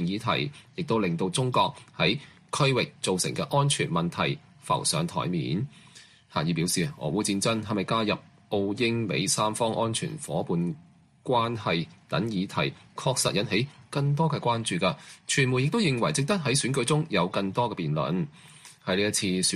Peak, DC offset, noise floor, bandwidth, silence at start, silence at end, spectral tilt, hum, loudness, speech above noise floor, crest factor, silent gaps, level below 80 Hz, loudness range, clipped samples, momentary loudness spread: -10 dBFS; under 0.1%; -53 dBFS; 13.5 kHz; 0 s; 0 s; -4.5 dB/octave; none; -27 LUFS; 26 dB; 18 dB; none; -60 dBFS; 3 LU; under 0.1%; 7 LU